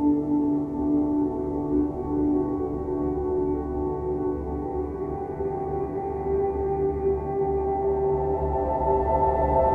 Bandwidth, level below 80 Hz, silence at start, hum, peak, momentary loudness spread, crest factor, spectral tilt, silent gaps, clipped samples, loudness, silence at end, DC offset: 2.8 kHz; -38 dBFS; 0 s; none; -10 dBFS; 7 LU; 14 dB; -11.5 dB/octave; none; under 0.1%; -26 LUFS; 0 s; under 0.1%